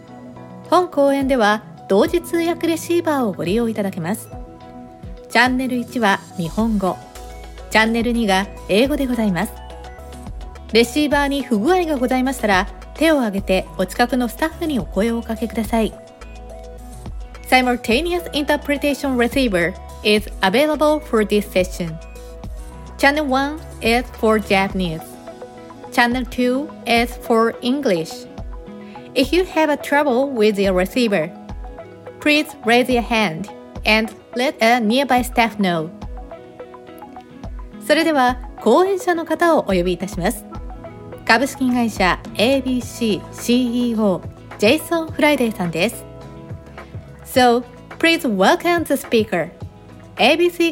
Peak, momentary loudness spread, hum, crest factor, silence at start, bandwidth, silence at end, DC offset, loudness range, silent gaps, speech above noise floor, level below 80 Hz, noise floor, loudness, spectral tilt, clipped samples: 0 dBFS; 20 LU; none; 18 dB; 0 s; 17 kHz; 0 s; under 0.1%; 3 LU; none; 22 dB; -38 dBFS; -40 dBFS; -18 LUFS; -4.5 dB/octave; under 0.1%